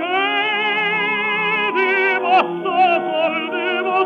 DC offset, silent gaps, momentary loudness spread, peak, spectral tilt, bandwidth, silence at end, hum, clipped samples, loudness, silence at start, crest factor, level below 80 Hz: under 0.1%; none; 4 LU; -4 dBFS; -5.5 dB/octave; 6.6 kHz; 0 s; none; under 0.1%; -17 LUFS; 0 s; 14 dB; -82 dBFS